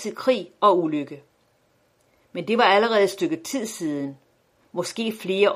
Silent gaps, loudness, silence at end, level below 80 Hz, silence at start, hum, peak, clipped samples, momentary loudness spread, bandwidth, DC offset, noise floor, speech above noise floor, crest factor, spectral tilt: none; -23 LUFS; 0 s; -74 dBFS; 0 s; none; -4 dBFS; under 0.1%; 16 LU; 15.5 kHz; under 0.1%; -64 dBFS; 42 dB; 20 dB; -4 dB/octave